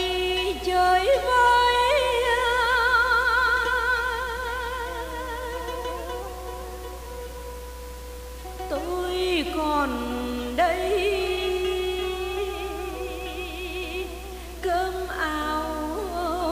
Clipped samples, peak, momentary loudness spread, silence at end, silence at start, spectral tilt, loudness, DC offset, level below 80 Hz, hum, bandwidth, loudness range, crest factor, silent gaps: under 0.1%; -10 dBFS; 17 LU; 0 s; 0 s; -3.5 dB/octave; -24 LUFS; under 0.1%; -40 dBFS; none; 15.5 kHz; 13 LU; 16 dB; none